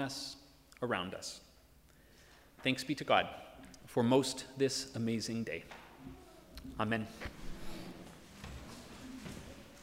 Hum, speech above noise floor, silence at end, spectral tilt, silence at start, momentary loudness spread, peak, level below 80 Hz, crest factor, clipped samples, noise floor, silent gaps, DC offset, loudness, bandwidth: none; 27 dB; 0 s; -4.5 dB/octave; 0 s; 21 LU; -14 dBFS; -58 dBFS; 26 dB; under 0.1%; -63 dBFS; none; under 0.1%; -37 LUFS; 16 kHz